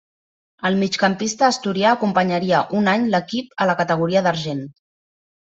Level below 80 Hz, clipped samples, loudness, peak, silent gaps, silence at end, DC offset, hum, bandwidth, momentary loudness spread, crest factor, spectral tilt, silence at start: -62 dBFS; under 0.1%; -19 LUFS; -2 dBFS; none; 0.7 s; under 0.1%; none; 8 kHz; 8 LU; 18 dB; -5 dB/octave; 0.65 s